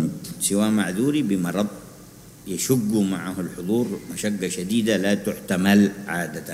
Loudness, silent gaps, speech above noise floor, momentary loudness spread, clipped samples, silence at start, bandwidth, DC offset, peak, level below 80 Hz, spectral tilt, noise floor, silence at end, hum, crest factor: -23 LUFS; none; 22 dB; 10 LU; under 0.1%; 0 s; 16 kHz; under 0.1%; -4 dBFS; -56 dBFS; -5 dB/octave; -45 dBFS; 0 s; none; 18 dB